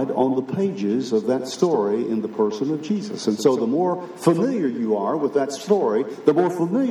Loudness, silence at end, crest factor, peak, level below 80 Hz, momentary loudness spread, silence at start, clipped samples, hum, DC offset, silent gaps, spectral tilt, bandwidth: -22 LUFS; 0 s; 18 dB; -2 dBFS; -80 dBFS; 5 LU; 0 s; under 0.1%; none; under 0.1%; none; -6.5 dB/octave; 13.5 kHz